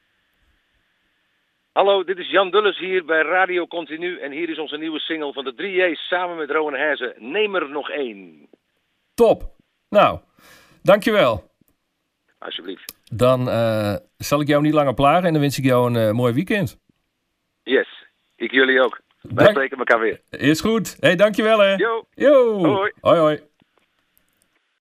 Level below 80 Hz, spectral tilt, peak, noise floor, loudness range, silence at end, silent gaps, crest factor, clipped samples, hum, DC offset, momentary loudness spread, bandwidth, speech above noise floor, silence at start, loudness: -52 dBFS; -5.5 dB/octave; -2 dBFS; -73 dBFS; 6 LU; 1.45 s; none; 18 dB; under 0.1%; none; under 0.1%; 13 LU; 15.5 kHz; 55 dB; 1.75 s; -19 LUFS